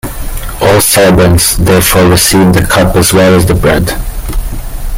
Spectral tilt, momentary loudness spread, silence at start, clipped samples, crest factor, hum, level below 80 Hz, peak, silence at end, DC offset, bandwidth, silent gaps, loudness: -4.5 dB/octave; 15 LU; 0.05 s; 0.2%; 8 dB; none; -18 dBFS; 0 dBFS; 0 s; under 0.1%; 17.5 kHz; none; -6 LUFS